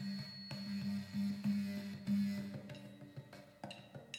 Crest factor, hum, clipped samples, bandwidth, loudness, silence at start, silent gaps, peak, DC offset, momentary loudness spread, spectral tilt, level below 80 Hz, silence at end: 14 dB; none; under 0.1%; 15.5 kHz; -42 LUFS; 0 s; none; -28 dBFS; under 0.1%; 16 LU; -6.5 dB/octave; -80 dBFS; 0 s